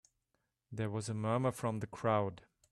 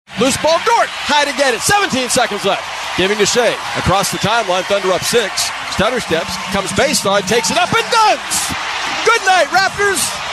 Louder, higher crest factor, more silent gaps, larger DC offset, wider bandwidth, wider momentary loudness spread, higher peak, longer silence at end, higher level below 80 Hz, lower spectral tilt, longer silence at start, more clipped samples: second, -37 LUFS vs -14 LUFS; first, 20 dB vs 14 dB; neither; neither; about the same, 13 kHz vs 13 kHz; about the same, 8 LU vs 6 LU; second, -18 dBFS vs -2 dBFS; first, 0.35 s vs 0 s; second, -70 dBFS vs -42 dBFS; first, -6.5 dB/octave vs -2.5 dB/octave; first, 0.7 s vs 0.1 s; neither